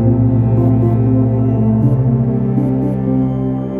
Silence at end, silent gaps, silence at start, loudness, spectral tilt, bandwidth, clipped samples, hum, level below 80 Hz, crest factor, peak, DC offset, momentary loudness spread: 0 s; none; 0 s; -14 LUFS; -12.5 dB/octave; 2.8 kHz; under 0.1%; none; -32 dBFS; 12 dB; -2 dBFS; under 0.1%; 3 LU